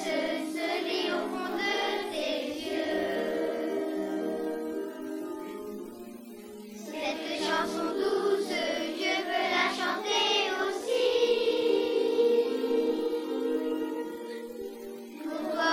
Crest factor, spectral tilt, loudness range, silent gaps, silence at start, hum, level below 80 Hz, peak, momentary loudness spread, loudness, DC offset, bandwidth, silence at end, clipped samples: 16 dB; -3 dB/octave; 8 LU; none; 0 s; none; -68 dBFS; -14 dBFS; 14 LU; -30 LUFS; under 0.1%; 16.5 kHz; 0 s; under 0.1%